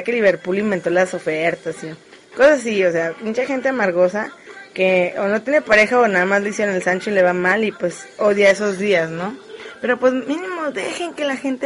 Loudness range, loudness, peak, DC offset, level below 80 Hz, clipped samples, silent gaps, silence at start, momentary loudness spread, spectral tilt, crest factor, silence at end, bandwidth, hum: 3 LU; -18 LUFS; -2 dBFS; under 0.1%; -60 dBFS; under 0.1%; none; 0 s; 13 LU; -5 dB/octave; 18 dB; 0 s; 11.5 kHz; none